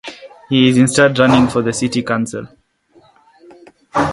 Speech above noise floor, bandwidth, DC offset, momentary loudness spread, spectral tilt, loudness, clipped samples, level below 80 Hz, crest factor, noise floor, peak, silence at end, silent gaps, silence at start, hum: 39 dB; 11.5 kHz; under 0.1%; 12 LU; -5 dB/octave; -14 LUFS; under 0.1%; -46 dBFS; 16 dB; -52 dBFS; 0 dBFS; 0 s; none; 0.05 s; none